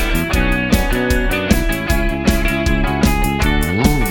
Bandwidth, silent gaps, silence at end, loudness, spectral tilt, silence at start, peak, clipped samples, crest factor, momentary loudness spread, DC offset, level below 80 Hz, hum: 17.5 kHz; none; 0 s; -16 LUFS; -5 dB/octave; 0 s; 0 dBFS; under 0.1%; 14 dB; 2 LU; under 0.1%; -20 dBFS; none